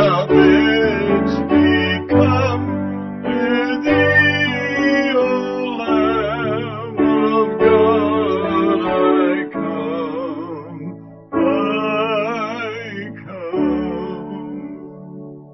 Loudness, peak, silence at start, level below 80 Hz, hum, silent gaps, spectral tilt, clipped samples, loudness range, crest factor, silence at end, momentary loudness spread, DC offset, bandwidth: -17 LUFS; 0 dBFS; 0 s; -40 dBFS; none; none; -7 dB/octave; under 0.1%; 6 LU; 16 dB; 0 s; 17 LU; under 0.1%; 6.2 kHz